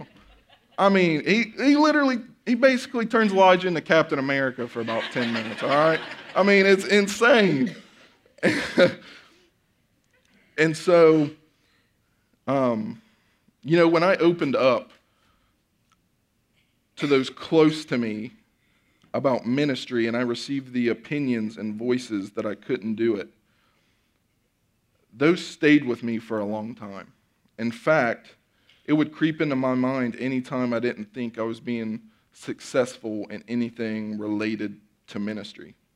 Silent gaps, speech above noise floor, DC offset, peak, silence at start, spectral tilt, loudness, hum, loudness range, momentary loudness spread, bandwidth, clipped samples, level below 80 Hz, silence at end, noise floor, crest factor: none; 47 dB; under 0.1%; -4 dBFS; 0 s; -5.5 dB/octave; -23 LUFS; none; 9 LU; 15 LU; 13.5 kHz; under 0.1%; -70 dBFS; 0.3 s; -70 dBFS; 20 dB